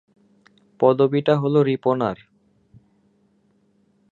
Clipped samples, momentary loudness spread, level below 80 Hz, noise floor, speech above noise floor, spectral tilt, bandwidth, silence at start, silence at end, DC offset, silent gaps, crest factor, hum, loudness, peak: under 0.1%; 8 LU; -64 dBFS; -62 dBFS; 44 dB; -9 dB/octave; 7.2 kHz; 0.8 s; 2 s; under 0.1%; none; 20 dB; none; -20 LUFS; -4 dBFS